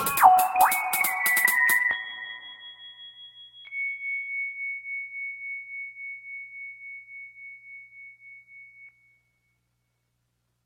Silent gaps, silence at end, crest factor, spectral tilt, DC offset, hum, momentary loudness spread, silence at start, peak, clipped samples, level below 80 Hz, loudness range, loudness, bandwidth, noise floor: none; 1.75 s; 26 dB; 0 dB/octave; under 0.1%; 60 Hz at -80 dBFS; 25 LU; 0 s; -4 dBFS; under 0.1%; -68 dBFS; 21 LU; -24 LUFS; 17 kHz; -75 dBFS